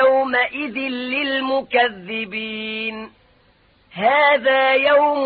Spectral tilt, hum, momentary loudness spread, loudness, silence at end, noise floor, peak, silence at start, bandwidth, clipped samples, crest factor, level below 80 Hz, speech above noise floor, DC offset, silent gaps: -8.5 dB/octave; none; 11 LU; -18 LUFS; 0 s; -56 dBFS; -4 dBFS; 0 s; 4.9 kHz; under 0.1%; 14 dB; -60 dBFS; 37 dB; under 0.1%; none